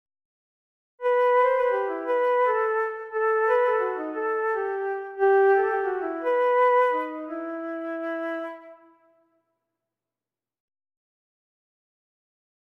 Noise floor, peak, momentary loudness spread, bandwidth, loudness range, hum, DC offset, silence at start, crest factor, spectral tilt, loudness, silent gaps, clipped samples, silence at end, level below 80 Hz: under -90 dBFS; -10 dBFS; 12 LU; 5.6 kHz; 12 LU; none; under 0.1%; 1 s; 16 dB; -4.5 dB/octave; -24 LUFS; none; under 0.1%; 3.95 s; -72 dBFS